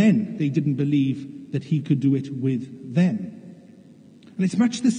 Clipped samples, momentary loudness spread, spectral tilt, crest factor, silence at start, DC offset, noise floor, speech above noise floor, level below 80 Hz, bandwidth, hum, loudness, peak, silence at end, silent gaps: under 0.1%; 10 LU; -7.5 dB/octave; 16 dB; 0 s; under 0.1%; -48 dBFS; 26 dB; -76 dBFS; 10 kHz; none; -23 LUFS; -6 dBFS; 0 s; none